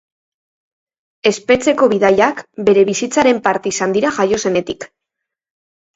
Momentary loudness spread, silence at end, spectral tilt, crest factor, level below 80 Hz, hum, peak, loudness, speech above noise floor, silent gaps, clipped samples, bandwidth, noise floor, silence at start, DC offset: 7 LU; 1.1 s; -4 dB/octave; 16 dB; -54 dBFS; none; 0 dBFS; -15 LUFS; 66 dB; none; under 0.1%; 8 kHz; -81 dBFS; 1.25 s; under 0.1%